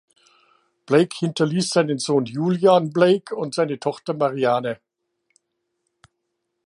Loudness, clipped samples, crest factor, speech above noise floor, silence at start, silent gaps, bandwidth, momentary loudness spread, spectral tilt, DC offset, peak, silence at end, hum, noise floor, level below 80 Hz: -21 LUFS; under 0.1%; 20 dB; 57 dB; 0.9 s; none; 11.5 kHz; 9 LU; -5.5 dB/octave; under 0.1%; -2 dBFS; 1.9 s; none; -77 dBFS; -72 dBFS